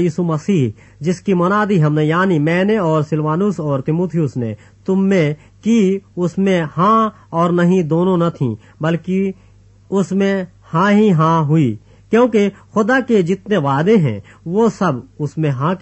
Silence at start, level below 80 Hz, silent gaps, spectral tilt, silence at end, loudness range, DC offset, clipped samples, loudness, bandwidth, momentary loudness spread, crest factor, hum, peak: 0 s; -54 dBFS; none; -7.5 dB/octave; 0.05 s; 3 LU; under 0.1%; under 0.1%; -16 LUFS; 8.4 kHz; 8 LU; 14 dB; none; -2 dBFS